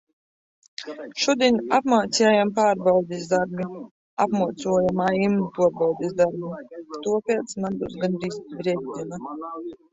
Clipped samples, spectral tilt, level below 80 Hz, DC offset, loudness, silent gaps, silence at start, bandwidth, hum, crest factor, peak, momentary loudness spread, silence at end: under 0.1%; -5 dB/octave; -62 dBFS; under 0.1%; -23 LUFS; 3.91-4.17 s; 0.8 s; 8 kHz; none; 18 dB; -6 dBFS; 15 LU; 0.2 s